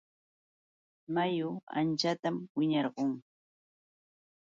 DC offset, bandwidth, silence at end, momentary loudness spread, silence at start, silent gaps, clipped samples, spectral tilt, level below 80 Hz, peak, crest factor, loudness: under 0.1%; 7.8 kHz; 1.2 s; 5 LU; 1.1 s; 1.63-1.67 s, 2.50-2.55 s; under 0.1%; -6 dB/octave; -80 dBFS; -18 dBFS; 18 dB; -33 LUFS